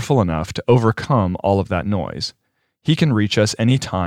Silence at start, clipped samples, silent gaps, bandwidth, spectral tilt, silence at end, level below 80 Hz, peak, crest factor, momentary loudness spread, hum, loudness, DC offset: 0 s; under 0.1%; none; 13.5 kHz; -6 dB/octave; 0 s; -46 dBFS; -2 dBFS; 16 dB; 9 LU; none; -19 LUFS; under 0.1%